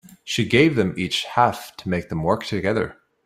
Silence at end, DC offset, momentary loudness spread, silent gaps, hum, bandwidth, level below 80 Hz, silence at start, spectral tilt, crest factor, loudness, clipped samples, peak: 0.3 s; under 0.1%; 10 LU; none; none; 16 kHz; -52 dBFS; 0.25 s; -5.5 dB/octave; 20 dB; -21 LUFS; under 0.1%; -2 dBFS